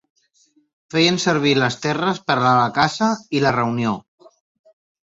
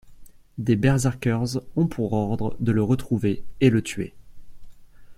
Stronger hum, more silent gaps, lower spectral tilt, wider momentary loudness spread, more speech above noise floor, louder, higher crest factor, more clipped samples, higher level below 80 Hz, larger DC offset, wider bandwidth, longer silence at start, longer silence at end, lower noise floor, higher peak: neither; neither; second, -5 dB/octave vs -7 dB/octave; second, 6 LU vs 10 LU; first, 42 dB vs 22 dB; first, -18 LUFS vs -24 LUFS; about the same, 18 dB vs 20 dB; neither; second, -56 dBFS vs -46 dBFS; neither; second, 8 kHz vs 15 kHz; first, 0.95 s vs 0.05 s; first, 1.15 s vs 0.05 s; first, -60 dBFS vs -44 dBFS; about the same, -2 dBFS vs -4 dBFS